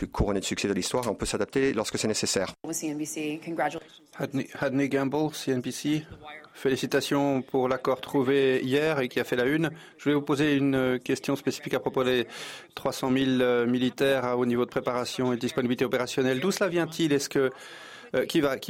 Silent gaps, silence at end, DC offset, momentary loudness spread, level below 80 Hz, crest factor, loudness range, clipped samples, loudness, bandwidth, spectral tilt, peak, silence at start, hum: none; 0 s; under 0.1%; 8 LU; -50 dBFS; 14 dB; 4 LU; under 0.1%; -27 LUFS; 16.5 kHz; -4.5 dB/octave; -12 dBFS; 0 s; none